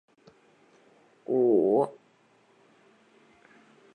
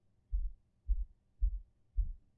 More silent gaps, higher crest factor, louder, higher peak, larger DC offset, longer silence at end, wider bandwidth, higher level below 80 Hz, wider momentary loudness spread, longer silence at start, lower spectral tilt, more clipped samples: neither; about the same, 18 dB vs 16 dB; first, -25 LUFS vs -43 LUFS; first, -12 dBFS vs -22 dBFS; neither; first, 2.05 s vs 0.2 s; first, 8.6 kHz vs 0.4 kHz; second, -82 dBFS vs -38 dBFS; about the same, 12 LU vs 10 LU; first, 1.3 s vs 0.3 s; about the same, -9.5 dB/octave vs -10 dB/octave; neither